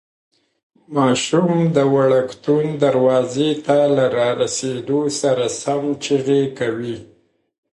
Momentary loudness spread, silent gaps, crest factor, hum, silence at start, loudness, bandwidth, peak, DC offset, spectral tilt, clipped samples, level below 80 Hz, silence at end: 7 LU; none; 16 dB; none; 0.9 s; -18 LUFS; 11.5 kHz; -2 dBFS; under 0.1%; -5.5 dB/octave; under 0.1%; -62 dBFS; 0.7 s